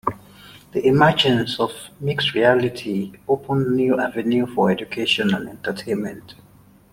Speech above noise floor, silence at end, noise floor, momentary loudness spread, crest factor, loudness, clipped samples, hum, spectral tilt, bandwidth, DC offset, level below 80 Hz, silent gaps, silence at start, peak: 25 dB; 0.6 s; -45 dBFS; 13 LU; 18 dB; -20 LUFS; under 0.1%; none; -6 dB/octave; 16.5 kHz; under 0.1%; -54 dBFS; none; 0.05 s; -2 dBFS